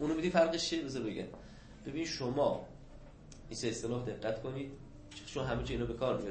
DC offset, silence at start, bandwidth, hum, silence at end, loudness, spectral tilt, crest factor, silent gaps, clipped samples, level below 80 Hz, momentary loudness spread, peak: under 0.1%; 0 s; 8.4 kHz; none; 0 s; -36 LUFS; -5 dB/octave; 20 dB; none; under 0.1%; -54 dBFS; 22 LU; -16 dBFS